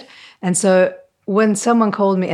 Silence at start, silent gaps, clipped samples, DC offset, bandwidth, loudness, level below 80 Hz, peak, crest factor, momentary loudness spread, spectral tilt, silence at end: 0.45 s; none; under 0.1%; under 0.1%; 14 kHz; -16 LUFS; -72 dBFS; -2 dBFS; 14 dB; 7 LU; -5 dB/octave; 0 s